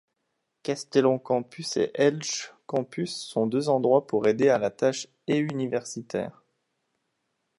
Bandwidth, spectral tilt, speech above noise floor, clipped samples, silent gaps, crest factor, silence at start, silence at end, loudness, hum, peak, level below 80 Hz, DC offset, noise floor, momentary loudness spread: 11.5 kHz; -5 dB/octave; 53 dB; under 0.1%; none; 18 dB; 0.65 s; 1.3 s; -26 LUFS; none; -8 dBFS; -72 dBFS; under 0.1%; -79 dBFS; 11 LU